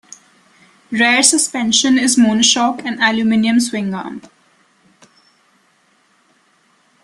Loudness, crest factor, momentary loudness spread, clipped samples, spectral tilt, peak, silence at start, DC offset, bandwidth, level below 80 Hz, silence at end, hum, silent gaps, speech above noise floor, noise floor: -13 LUFS; 18 dB; 13 LU; under 0.1%; -2 dB/octave; 0 dBFS; 0.9 s; under 0.1%; 12.5 kHz; -60 dBFS; 2.85 s; none; none; 43 dB; -57 dBFS